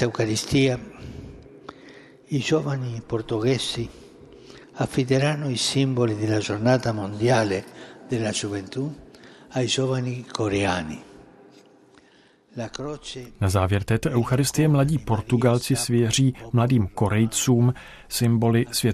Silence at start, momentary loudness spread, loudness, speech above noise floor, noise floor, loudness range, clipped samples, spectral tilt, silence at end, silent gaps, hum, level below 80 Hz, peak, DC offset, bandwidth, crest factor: 0 s; 15 LU; -23 LUFS; 34 dB; -56 dBFS; 6 LU; under 0.1%; -5.5 dB/octave; 0 s; none; none; -50 dBFS; -6 dBFS; under 0.1%; 14 kHz; 18 dB